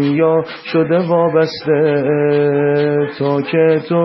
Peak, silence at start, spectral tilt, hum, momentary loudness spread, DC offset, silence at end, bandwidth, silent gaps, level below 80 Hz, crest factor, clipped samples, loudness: -2 dBFS; 0 s; -8.5 dB/octave; none; 4 LU; under 0.1%; 0 s; 6 kHz; none; -60 dBFS; 12 dB; under 0.1%; -15 LUFS